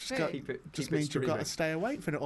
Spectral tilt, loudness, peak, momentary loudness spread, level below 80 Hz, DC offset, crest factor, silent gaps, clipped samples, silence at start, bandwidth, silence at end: -5 dB/octave; -33 LUFS; -18 dBFS; 7 LU; -62 dBFS; under 0.1%; 16 dB; none; under 0.1%; 0 s; 12 kHz; 0 s